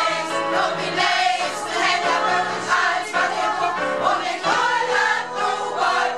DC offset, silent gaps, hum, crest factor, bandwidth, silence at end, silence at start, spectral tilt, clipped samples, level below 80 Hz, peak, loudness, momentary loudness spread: 0.3%; none; none; 16 dB; 13 kHz; 0 s; 0 s; -2 dB/octave; under 0.1%; -70 dBFS; -4 dBFS; -20 LUFS; 4 LU